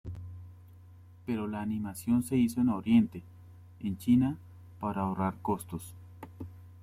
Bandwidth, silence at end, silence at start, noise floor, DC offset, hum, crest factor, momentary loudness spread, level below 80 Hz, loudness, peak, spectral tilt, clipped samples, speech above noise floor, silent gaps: 15 kHz; 0 s; 0.05 s; -53 dBFS; under 0.1%; none; 18 dB; 21 LU; -62 dBFS; -31 LUFS; -14 dBFS; -7 dB/octave; under 0.1%; 24 dB; none